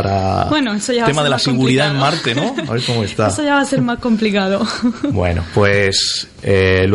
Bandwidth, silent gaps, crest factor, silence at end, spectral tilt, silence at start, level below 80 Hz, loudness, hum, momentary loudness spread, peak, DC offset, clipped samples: 11.5 kHz; none; 14 dB; 0 s; -5 dB/octave; 0 s; -40 dBFS; -15 LUFS; none; 5 LU; -2 dBFS; under 0.1%; under 0.1%